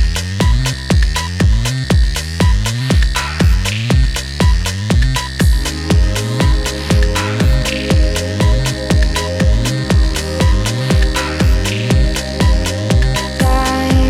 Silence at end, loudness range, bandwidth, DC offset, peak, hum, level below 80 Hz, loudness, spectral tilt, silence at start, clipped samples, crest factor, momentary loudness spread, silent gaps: 0 s; 0 LU; 16 kHz; under 0.1%; -2 dBFS; none; -16 dBFS; -15 LUFS; -5 dB/octave; 0 s; under 0.1%; 10 dB; 3 LU; none